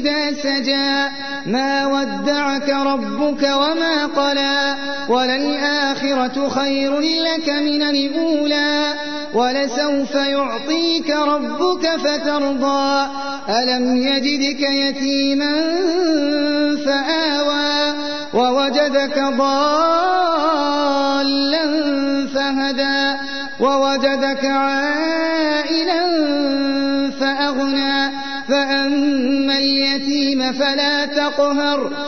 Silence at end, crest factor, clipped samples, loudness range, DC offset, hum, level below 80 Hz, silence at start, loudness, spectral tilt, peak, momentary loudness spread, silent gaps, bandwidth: 0 s; 14 dB; under 0.1%; 2 LU; 2%; none; -54 dBFS; 0 s; -17 LUFS; -3 dB/octave; -4 dBFS; 3 LU; none; 6.6 kHz